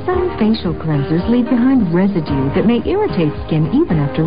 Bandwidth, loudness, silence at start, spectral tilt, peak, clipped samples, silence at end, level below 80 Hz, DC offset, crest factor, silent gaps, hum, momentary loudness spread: 5.2 kHz; -15 LUFS; 0 s; -13 dB/octave; -4 dBFS; under 0.1%; 0 s; -32 dBFS; 2%; 10 dB; none; none; 5 LU